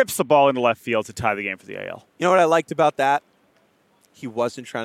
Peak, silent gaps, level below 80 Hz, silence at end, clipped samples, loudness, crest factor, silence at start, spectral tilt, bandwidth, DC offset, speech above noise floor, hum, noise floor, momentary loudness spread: -4 dBFS; none; -60 dBFS; 0 s; under 0.1%; -20 LUFS; 18 dB; 0 s; -4.5 dB/octave; 16 kHz; under 0.1%; 40 dB; none; -61 dBFS; 16 LU